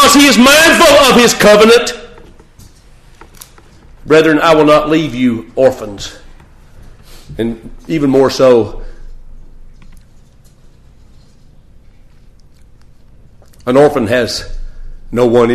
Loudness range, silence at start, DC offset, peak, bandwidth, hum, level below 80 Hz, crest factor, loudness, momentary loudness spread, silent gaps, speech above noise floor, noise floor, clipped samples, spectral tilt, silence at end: 9 LU; 0 s; under 0.1%; 0 dBFS; 14.5 kHz; none; -32 dBFS; 12 dB; -9 LUFS; 19 LU; none; 32 dB; -41 dBFS; under 0.1%; -3.5 dB/octave; 0 s